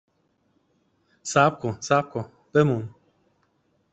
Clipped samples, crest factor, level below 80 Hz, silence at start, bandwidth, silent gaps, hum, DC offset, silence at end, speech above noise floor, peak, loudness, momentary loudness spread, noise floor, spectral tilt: under 0.1%; 22 dB; -64 dBFS; 1.25 s; 8.2 kHz; none; none; under 0.1%; 1.05 s; 46 dB; -4 dBFS; -24 LUFS; 14 LU; -68 dBFS; -5.5 dB/octave